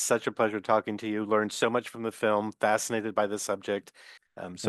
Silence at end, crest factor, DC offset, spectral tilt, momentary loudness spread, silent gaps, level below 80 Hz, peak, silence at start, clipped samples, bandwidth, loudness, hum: 0 s; 20 dB; under 0.1%; -3.5 dB/octave; 8 LU; none; -76 dBFS; -10 dBFS; 0 s; under 0.1%; 12.5 kHz; -29 LUFS; none